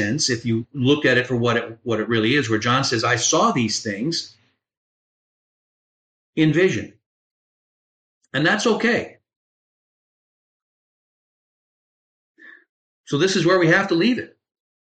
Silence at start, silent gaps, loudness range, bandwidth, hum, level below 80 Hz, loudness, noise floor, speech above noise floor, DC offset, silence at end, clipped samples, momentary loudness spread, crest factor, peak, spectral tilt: 0 s; 4.77-6.33 s, 7.06-8.21 s, 9.36-12.35 s, 12.69-13.04 s; 6 LU; 9.4 kHz; none; -62 dBFS; -20 LUFS; under -90 dBFS; over 71 dB; under 0.1%; 0.55 s; under 0.1%; 10 LU; 16 dB; -6 dBFS; -4 dB/octave